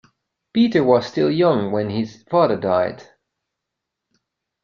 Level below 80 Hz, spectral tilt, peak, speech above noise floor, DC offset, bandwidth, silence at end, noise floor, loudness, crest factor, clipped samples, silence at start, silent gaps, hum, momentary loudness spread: -60 dBFS; -7.5 dB/octave; -2 dBFS; 63 dB; under 0.1%; 7.2 kHz; 1.6 s; -81 dBFS; -19 LUFS; 18 dB; under 0.1%; 0.55 s; none; none; 8 LU